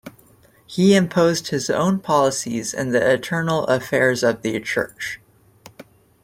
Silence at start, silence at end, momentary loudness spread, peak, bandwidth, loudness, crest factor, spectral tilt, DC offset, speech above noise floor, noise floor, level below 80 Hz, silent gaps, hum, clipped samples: 0.05 s; 0.4 s; 10 LU; -4 dBFS; 16.5 kHz; -20 LUFS; 18 dB; -5 dB/octave; under 0.1%; 34 dB; -53 dBFS; -58 dBFS; none; none; under 0.1%